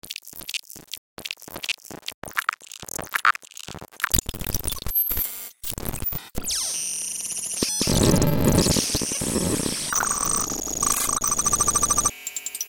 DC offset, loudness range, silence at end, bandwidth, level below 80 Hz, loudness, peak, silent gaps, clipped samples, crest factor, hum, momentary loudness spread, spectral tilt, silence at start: under 0.1%; 6 LU; 0 s; 17.5 kHz; -38 dBFS; -23 LUFS; 0 dBFS; 0.98-1.17 s, 2.14-2.22 s; under 0.1%; 26 dB; none; 15 LU; -2.5 dB/octave; 0.05 s